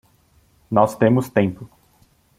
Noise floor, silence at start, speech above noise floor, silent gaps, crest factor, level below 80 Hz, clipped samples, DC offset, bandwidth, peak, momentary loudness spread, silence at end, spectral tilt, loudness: -58 dBFS; 0.7 s; 40 dB; none; 20 dB; -56 dBFS; under 0.1%; under 0.1%; 16 kHz; -2 dBFS; 8 LU; 0.75 s; -7.5 dB/octave; -19 LUFS